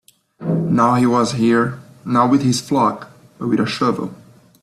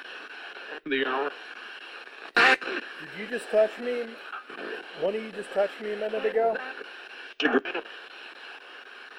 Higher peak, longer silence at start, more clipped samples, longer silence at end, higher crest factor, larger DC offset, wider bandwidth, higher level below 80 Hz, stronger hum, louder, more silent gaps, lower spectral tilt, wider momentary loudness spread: first, -4 dBFS vs -8 dBFS; first, 0.4 s vs 0 s; neither; first, 0.5 s vs 0 s; second, 14 dB vs 22 dB; neither; second, 13.5 kHz vs 15.5 kHz; first, -56 dBFS vs -78 dBFS; neither; first, -17 LUFS vs -28 LUFS; neither; first, -6 dB/octave vs -3.5 dB/octave; second, 13 LU vs 17 LU